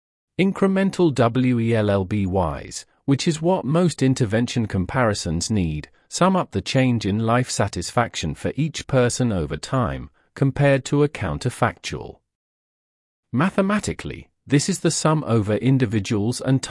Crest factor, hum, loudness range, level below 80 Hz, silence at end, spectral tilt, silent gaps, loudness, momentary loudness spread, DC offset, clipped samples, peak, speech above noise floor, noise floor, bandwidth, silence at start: 16 dB; none; 3 LU; -46 dBFS; 0 s; -5.5 dB/octave; 12.35-13.23 s; -21 LUFS; 9 LU; under 0.1%; under 0.1%; -6 dBFS; over 69 dB; under -90 dBFS; 12 kHz; 0.4 s